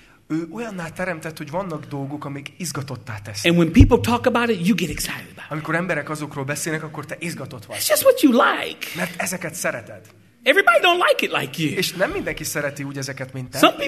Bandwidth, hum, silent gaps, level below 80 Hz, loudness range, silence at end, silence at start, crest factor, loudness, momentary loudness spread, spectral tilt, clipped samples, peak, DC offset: 13.5 kHz; none; none; -34 dBFS; 6 LU; 0 s; 0.3 s; 22 dB; -21 LUFS; 15 LU; -4.5 dB/octave; under 0.1%; 0 dBFS; under 0.1%